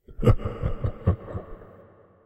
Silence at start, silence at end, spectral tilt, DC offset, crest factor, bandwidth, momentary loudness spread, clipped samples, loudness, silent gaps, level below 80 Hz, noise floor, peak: 0.1 s; 0.55 s; -9.5 dB/octave; under 0.1%; 20 dB; 12 kHz; 19 LU; under 0.1%; -27 LUFS; none; -32 dBFS; -53 dBFS; -6 dBFS